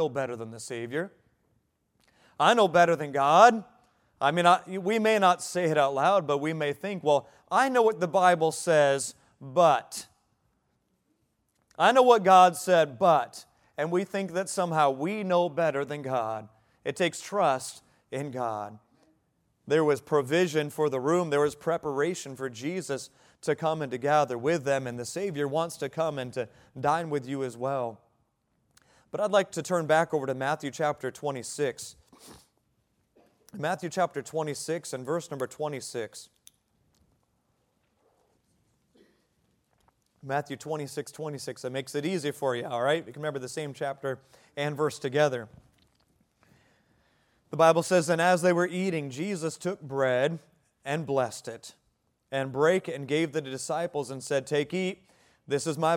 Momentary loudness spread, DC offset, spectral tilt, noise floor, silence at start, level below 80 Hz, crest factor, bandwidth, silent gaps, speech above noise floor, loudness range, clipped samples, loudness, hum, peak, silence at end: 14 LU; under 0.1%; -4.5 dB/octave; -74 dBFS; 0 s; -74 dBFS; 24 dB; 17 kHz; none; 47 dB; 11 LU; under 0.1%; -27 LUFS; none; -4 dBFS; 0 s